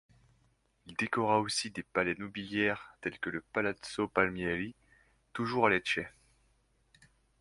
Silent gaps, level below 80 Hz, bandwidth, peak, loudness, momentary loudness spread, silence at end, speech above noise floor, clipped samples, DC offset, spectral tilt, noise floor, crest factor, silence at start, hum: none; -64 dBFS; 11.5 kHz; -10 dBFS; -33 LUFS; 10 LU; 1.3 s; 39 dB; under 0.1%; under 0.1%; -4 dB/octave; -72 dBFS; 24 dB; 0.85 s; none